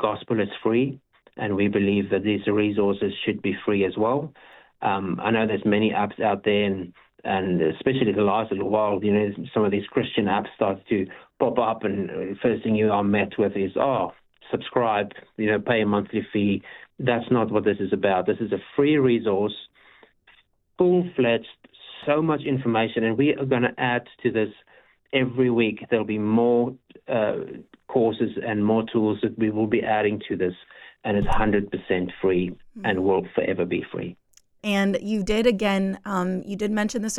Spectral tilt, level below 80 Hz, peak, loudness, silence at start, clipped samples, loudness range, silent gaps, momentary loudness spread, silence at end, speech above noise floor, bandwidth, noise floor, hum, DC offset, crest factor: -6.5 dB/octave; -48 dBFS; -6 dBFS; -24 LUFS; 0 s; under 0.1%; 2 LU; none; 7 LU; 0 s; 36 dB; 12 kHz; -59 dBFS; none; under 0.1%; 18 dB